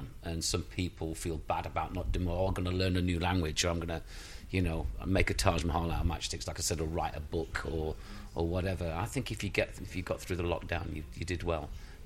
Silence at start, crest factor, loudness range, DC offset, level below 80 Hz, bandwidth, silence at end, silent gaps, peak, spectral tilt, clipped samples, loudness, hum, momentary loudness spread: 0 s; 22 dB; 3 LU; under 0.1%; -42 dBFS; 16 kHz; 0 s; none; -12 dBFS; -5 dB/octave; under 0.1%; -34 LUFS; none; 8 LU